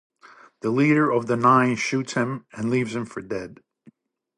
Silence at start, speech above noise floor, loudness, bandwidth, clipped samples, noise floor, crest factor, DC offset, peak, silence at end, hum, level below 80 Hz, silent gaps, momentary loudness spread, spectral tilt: 0.65 s; 34 dB; -22 LUFS; 11 kHz; under 0.1%; -56 dBFS; 18 dB; under 0.1%; -6 dBFS; 0.85 s; none; -64 dBFS; none; 14 LU; -6 dB/octave